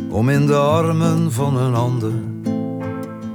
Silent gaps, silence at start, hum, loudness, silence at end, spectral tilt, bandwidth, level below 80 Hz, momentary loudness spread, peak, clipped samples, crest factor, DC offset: none; 0 s; none; -18 LUFS; 0 s; -7.5 dB/octave; 18.5 kHz; -52 dBFS; 10 LU; -4 dBFS; under 0.1%; 14 dB; under 0.1%